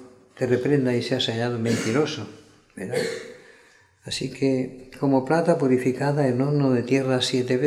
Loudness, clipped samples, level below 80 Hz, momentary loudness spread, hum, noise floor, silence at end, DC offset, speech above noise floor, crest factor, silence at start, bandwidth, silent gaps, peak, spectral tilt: -23 LUFS; under 0.1%; -62 dBFS; 10 LU; none; -56 dBFS; 0 s; under 0.1%; 33 dB; 18 dB; 0 s; 13.5 kHz; none; -6 dBFS; -6 dB/octave